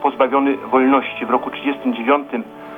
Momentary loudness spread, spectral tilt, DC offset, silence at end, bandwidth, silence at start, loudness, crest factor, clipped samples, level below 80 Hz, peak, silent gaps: 8 LU; -7 dB/octave; under 0.1%; 0 s; 3.8 kHz; 0 s; -18 LUFS; 14 dB; under 0.1%; -62 dBFS; -4 dBFS; none